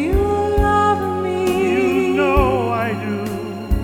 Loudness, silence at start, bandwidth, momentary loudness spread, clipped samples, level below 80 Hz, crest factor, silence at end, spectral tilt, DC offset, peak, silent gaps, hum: -18 LUFS; 0 s; 18 kHz; 8 LU; under 0.1%; -26 dBFS; 16 dB; 0 s; -7 dB/octave; under 0.1%; -2 dBFS; none; none